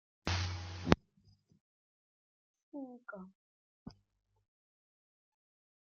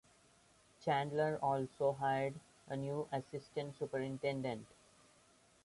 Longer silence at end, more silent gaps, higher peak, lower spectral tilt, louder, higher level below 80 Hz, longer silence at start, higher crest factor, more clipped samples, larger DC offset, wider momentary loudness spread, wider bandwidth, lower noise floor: first, 2.05 s vs 1 s; first, 1.60-2.54 s, 2.63-2.72 s, 3.35-3.86 s vs none; first, -6 dBFS vs -24 dBFS; second, -5 dB/octave vs -6.5 dB/octave; about the same, -37 LUFS vs -39 LUFS; first, -58 dBFS vs -74 dBFS; second, 0.25 s vs 0.8 s; first, 36 dB vs 18 dB; neither; neither; first, 23 LU vs 10 LU; second, 7.2 kHz vs 11.5 kHz; about the same, -70 dBFS vs -69 dBFS